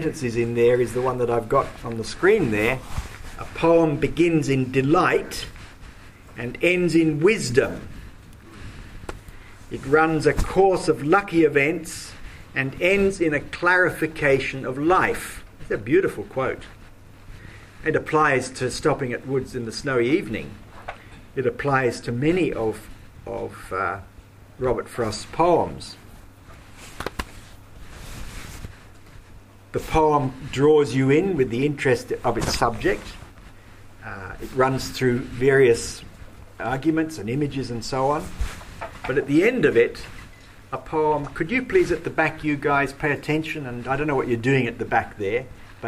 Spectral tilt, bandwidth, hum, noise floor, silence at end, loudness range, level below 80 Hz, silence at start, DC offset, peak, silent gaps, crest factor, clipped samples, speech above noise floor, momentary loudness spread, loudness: -6 dB/octave; 15.5 kHz; none; -46 dBFS; 0 s; 6 LU; -40 dBFS; 0 s; under 0.1%; -4 dBFS; none; 20 dB; under 0.1%; 24 dB; 20 LU; -22 LUFS